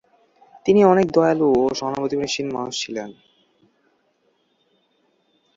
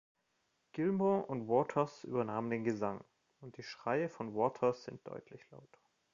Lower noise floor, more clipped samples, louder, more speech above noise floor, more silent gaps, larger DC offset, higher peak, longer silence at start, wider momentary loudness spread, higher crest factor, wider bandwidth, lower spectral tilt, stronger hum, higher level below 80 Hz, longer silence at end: second, -66 dBFS vs -80 dBFS; neither; first, -19 LUFS vs -36 LUFS; about the same, 47 dB vs 44 dB; neither; neither; first, -2 dBFS vs -18 dBFS; about the same, 0.65 s vs 0.75 s; second, 13 LU vs 17 LU; about the same, 20 dB vs 20 dB; about the same, 7.8 kHz vs 7.4 kHz; about the same, -5.5 dB/octave vs -6.5 dB/octave; neither; first, -58 dBFS vs -76 dBFS; first, 2.45 s vs 0.5 s